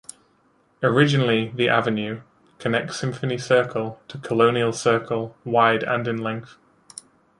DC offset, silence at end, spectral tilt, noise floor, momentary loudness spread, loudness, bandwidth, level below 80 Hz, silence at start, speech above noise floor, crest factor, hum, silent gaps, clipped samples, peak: under 0.1%; 0.95 s; -5.5 dB/octave; -62 dBFS; 18 LU; -22 LUFS; 11.5 kHz; -62 dBFS; 0.8 s; 40 dB; 20 dB; none; none; under 0.1%; -2 dBFS